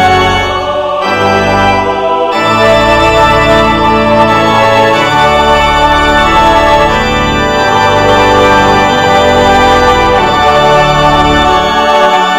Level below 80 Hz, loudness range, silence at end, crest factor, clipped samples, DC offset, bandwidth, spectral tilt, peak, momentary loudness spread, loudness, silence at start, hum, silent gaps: -22 dBFS; 1 LU; 0 s; 6 dB; 4%; 0.9%; 17 kHz; -4.5 dB/octave; 0 dBFS; 4 LU; -7 LUFS; 0 s; none; none